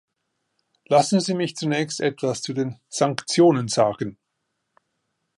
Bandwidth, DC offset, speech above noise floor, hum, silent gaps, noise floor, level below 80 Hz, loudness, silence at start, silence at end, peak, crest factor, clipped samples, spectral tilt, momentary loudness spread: 11.5 kHz; under 0.1%; 56 dB; none; none; -77 dBFS; -66 dBFS; -22 LUFS; 0.9 s; 1.25 s; -4 dBFS; 18 dB; under 0.1%; -5 dB/octave; 10 LU